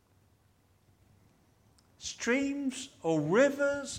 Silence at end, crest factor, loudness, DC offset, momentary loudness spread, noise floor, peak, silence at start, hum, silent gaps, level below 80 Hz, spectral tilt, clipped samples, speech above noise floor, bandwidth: 0 s; 20 dB; -30 LUFS; under 0.1%; 12 LU; -68 dBFS; -14 dBFS; 2 s; none; none; -70 dBFS; -4.5 dB/octave; under 0.1%; 38 dB; 15 kHz